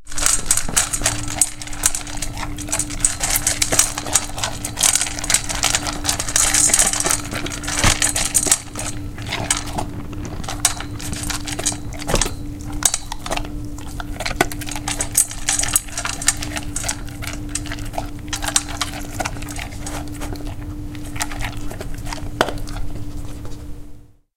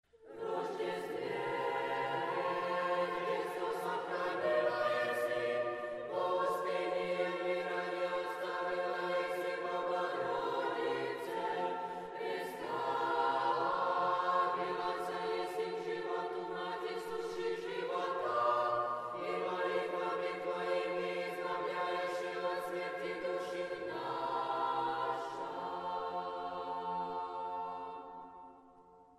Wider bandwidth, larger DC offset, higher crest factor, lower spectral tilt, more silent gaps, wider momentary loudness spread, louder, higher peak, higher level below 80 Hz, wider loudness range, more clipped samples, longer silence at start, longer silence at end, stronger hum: first, 17 kHz vs 14.5 kHz; neither; first, 22 dB vs 16 dB; second, -1.5 dB/octave vs -4.5 dB/octave; neither; first, 16 LU vs 7 LU; first, -19 LUFS vs -37 LUFS; first, 0 dBFS vs -20 dBFS; first, -30 dBFS vs -76 dBFS; first, 11 LU vs 4 LU; neither; second, 0 s vs 0.2 s; about the same, 0.25 s vs 0.15 s; neither